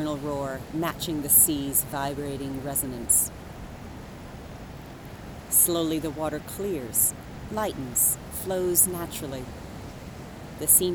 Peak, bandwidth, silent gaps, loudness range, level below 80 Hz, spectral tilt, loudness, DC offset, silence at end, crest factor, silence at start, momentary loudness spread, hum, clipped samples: -6 dBFS; over 20 kHz; none; 4 LU; -46 dBFS; -3 dB/octave; -24 LUFS; under 0.1%; 0 s; 22 dB; 0 s; 22 LU; none; under 0.1%